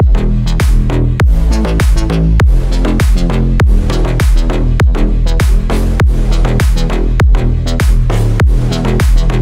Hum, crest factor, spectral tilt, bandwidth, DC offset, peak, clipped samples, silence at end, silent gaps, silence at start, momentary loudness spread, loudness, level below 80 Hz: none; 8 dB; -6.5 dB/octave; 13.5 kHz; under 0.1%; 0 dBFS; under 0.1%; 0 s; none; 0 s; 3 LU; -12 LUFS; -10 dBFS